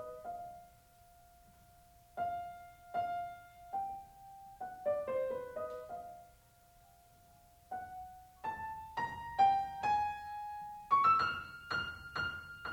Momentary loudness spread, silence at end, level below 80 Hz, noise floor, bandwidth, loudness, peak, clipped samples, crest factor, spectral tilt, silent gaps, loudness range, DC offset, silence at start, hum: 21 LU; 0 s; -68 dBFS; -64 dBFS; over 20 kHz; -37 LUFS; -20 dBFS; under 0.1%; 20 dB; -4.5 dB/octave; none; 13 LU; under 0.1%; 0 s; none